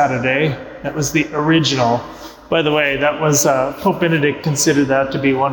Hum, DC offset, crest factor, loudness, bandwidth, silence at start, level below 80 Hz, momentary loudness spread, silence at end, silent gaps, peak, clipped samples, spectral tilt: none; under 0.1%; 12 dB; -16 LUFS; 19 kHz; 0 s; -46 dBFS; 7 LU; 0 s; none; -4 dBFS; under 0.1%; -4 dB/octave